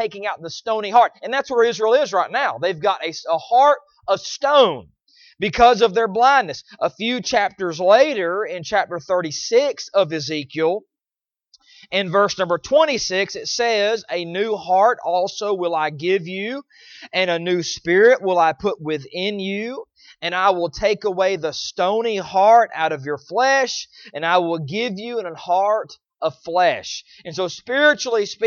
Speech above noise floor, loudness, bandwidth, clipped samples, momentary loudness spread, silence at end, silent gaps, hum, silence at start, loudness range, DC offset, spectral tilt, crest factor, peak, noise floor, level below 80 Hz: over 71 dB; -19 LUFS; 7.2 kHz; under 0.1%; 12 LU; 0 s; none; none; 0 s; 4 LU; under 0.1%; -3.5 dB/octave; 18 dB; -2 dBFS; under -90 dBFS; -54 dBFS